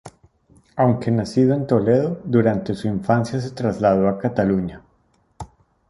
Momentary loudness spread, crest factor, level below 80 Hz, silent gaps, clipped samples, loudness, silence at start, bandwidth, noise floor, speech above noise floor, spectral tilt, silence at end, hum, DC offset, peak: 15 LU; 18 dB; -50 dBFS; none; under 0.1%; -20 LUFS; 0.05 s; 11.5 kHz; -62 dBFS; 43 dB; -8.5 dB/octave; 0.45 s; none; under 0.1%; -4 dBFS